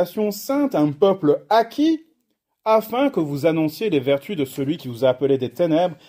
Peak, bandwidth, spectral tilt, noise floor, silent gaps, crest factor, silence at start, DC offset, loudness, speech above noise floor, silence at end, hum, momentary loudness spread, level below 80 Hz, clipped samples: -4 dBFS; 16 kHz; -6.5 dB/octave; -72 dBFS; none; 16 dB; 0 s; under 0.1%; -20 LUFS; 53 dB; 0.15 s; none; 7 LU; -66 dBFS; under 0.1%